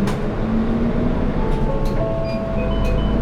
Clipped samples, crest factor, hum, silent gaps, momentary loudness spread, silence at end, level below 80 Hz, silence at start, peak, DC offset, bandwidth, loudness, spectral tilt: under 0.1%; 12 dB; none; none; 2 LU; 0 s; -22 dBFS; 0 s; -8 dBFS; under 0.1%; 10.5 kHz; -21 LUFS; -8 dB/octave